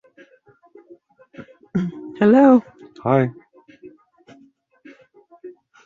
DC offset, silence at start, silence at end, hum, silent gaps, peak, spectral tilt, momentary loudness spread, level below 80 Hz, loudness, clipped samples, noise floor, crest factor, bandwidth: under 0.1%; 1.4 s; 0.35 s; none; none; -2 dBFS; -9.5 dB/octave; 15 LU; -62 dBFS; -18 LUFS; under 0.1%; -55 dBFS; 20 dB; 7 kHz